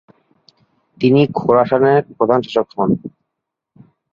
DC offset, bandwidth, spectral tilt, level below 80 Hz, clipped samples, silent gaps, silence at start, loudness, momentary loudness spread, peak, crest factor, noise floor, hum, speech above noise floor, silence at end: under 0.1%; 7 kHz; -8.5 dB/octave; -56 dBFS; under 0.1%; none; 1 s; -15 LUFS; 7 LU; -2 dBFS; 16 dB; -79 dBFS; none; 65 dB; 1.05 s